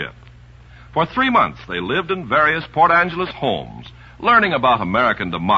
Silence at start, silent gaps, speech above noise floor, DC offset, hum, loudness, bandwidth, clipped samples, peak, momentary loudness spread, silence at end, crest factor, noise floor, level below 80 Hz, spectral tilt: 0 s; none; 25 dB; under 0.1%; 60 Hz at -45 dBFS; -17 LUFS; 7.6 kHz; under 0.1%; -2 dBFS; 12 LU; 0 s; 16 dB; -43 dBFS; -46 dBFS; -7 dB/octave